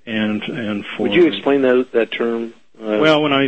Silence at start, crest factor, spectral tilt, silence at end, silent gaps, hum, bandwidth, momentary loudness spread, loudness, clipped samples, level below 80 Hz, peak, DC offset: 0.05 s; 16 dB; -6.5 dB/octave; 0 s; none; none; 8.4 kHz; 10 LU; -17 LUFS; under 0.1%; -60 dBFS; -2 dBFS; 0.4%